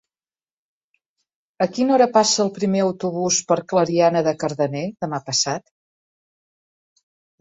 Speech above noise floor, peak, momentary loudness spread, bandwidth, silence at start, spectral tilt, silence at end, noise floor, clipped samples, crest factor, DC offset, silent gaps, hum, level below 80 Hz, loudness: over 71 dB; -4 dBFS; 9 LU; 8.2 kHz; 1.6 s; -4 dB/octave; 1.8 s; under -90 dBFS; under 0.1%; 18 dB; under 0.1%; none; none; -64 dBFS; -20 LUFS